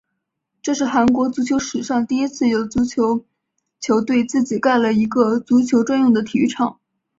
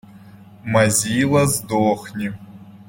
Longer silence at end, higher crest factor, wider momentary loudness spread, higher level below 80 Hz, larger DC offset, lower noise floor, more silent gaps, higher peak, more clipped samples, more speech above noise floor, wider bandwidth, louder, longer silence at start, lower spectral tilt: first, 0.5 s vs 0.05 s; about the same, 16 dB vs 18 dB; second, 6 LU vs 13 LU; about the same, -52 dBFS vs -52 dBFS; neither; first, -77 dBFS vs -43 dBFS; neither; about the same, -2 dBFS vs -2 dBFS; neither; first, 60 dB vs 25 dB; second, 7.8 kHz vs 16.5 kHz; about the same, -18 LUFS vs -19 LUFS; first, 0.65 s vs 0.15 s; about the same, -5 dB/octave vs -4.5 dB/octave